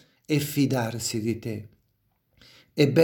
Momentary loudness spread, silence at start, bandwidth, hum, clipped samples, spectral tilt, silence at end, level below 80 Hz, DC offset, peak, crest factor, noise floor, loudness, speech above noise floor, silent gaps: 12 LU; 0.3 s; 17.5 kHz; none; under 0.1%; -5.5 dB/octave; 0 s; -64 dBFS; under 0.1%; -6 dBFS; 20 dB; -71 dBFS; -27 LUFS; 47 dB; none